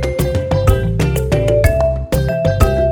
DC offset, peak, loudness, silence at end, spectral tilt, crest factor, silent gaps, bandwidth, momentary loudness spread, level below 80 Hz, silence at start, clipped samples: under 0.1%; 0 dBFS; -15 LUFS; 0 s; -7 dB/octave; 14 dB; none; 19.5 kHz; 4 LU; -20 dBFS; 0 s; under 0.1%